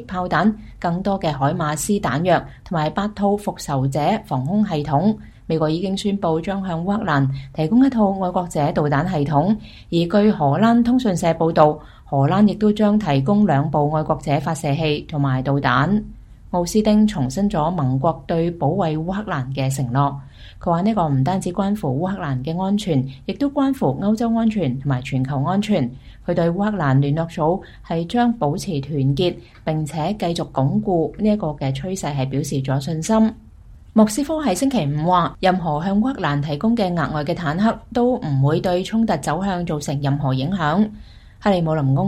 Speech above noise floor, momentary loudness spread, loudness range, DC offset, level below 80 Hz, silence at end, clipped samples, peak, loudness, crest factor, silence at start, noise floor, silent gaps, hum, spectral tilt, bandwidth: 24 dB; 7 LU; 4 LU; under 0.1%; -42 dBFS; 0 s; under 0.1%; 0 dBFS; -20 LUFS; 20 dB; 0 s; -43 dBFS; none; none; -7 dB/octave; 13.5 kHz